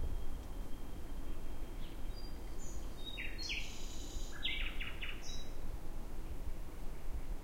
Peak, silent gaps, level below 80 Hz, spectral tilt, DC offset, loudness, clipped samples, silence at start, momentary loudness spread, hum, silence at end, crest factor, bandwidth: -24 dBFS; none; -42 dBFS; -3.5 dB/octave; under 0.1%; -46 LUFS; under 0.1%; 0 s; 9 LU; none; 0 s; 14 dB; 16 kHz